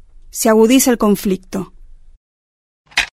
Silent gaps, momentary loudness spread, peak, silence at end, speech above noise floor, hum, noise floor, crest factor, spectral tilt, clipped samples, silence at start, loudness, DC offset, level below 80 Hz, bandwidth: 2.17-2.85 s; 17 LU; 0 dBFS; 0.1 s; over 77 dB; none; under -90 dBFS; 16 dB; -4 dB/octave; under 0.1%; 0.35 s; -14 LUFS; under 0.1%; -42 dBFS; 16 kHz